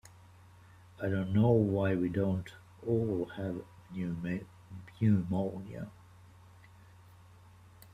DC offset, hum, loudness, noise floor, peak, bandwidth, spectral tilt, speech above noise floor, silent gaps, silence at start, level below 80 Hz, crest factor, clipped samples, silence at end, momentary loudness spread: under 0.1%; none; -33 LUFS; -57 dBFS; -14 dBFS; 14 kHz; -9 dB/octave; 26 dB; none; 1 s; -64 dBFS; 20 dB; under 0.1%; 2.05 s; 18 LU